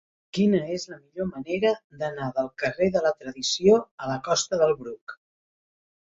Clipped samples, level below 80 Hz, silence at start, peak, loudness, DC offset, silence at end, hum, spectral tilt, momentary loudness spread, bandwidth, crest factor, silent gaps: under 0.1%; -62 dBFS; 0.35 s; -6 dBFS; -25 LUFS; under 0.1%; 1 s; none; -4.5 dB/octave; 12 LU; 7.8 kHz; 20 dB; 1.84-1.90 s, 3.91-3.98 s, 5.01-5.07 s